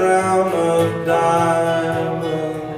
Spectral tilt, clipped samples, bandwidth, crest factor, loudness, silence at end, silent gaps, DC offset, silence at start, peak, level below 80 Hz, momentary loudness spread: -5.5 dB/octave; under 0.1%; 15 kHz; 14 dB; -18 LUFS; 0 s; none; under 0.1%; 0 s; -4 dBFS; -54 dBFS; 6 LU